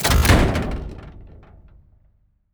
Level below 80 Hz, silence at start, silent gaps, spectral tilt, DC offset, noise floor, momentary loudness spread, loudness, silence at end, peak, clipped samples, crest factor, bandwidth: -26 dBFS; 0 s; none; -4.5 dB/octave; under 0.1%; -60 dBFS; 25 LU; -19 LUFS; 1.25 s; -6 dBFS; under 0.1%; 16 dB; over 20 kHz